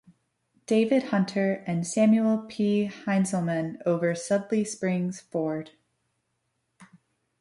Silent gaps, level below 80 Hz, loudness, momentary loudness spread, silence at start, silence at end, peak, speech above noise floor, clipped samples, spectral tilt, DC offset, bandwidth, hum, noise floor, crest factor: none; -72 dBFS; -26 LUFS; 7 LU; 0.7 s; 0.55 s; -12 dBFS; 52 dB; under 0.1%; -6 dB/octave; under 0.1%; 11.5 kHz; none; -77 dBFS; 16 dB